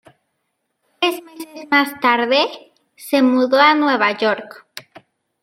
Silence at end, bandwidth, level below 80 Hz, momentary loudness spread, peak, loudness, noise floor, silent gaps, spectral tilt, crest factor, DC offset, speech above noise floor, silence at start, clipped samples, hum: 0.65 s; 16.5 kHz; -74 dBFS; 23 LU; -2 dBFS; -16 LUFS; -73 dBFS; none; -3.5 dB/octave; 18 dB; under 0.1%; 56 dB; 1 s; under 0.1%; none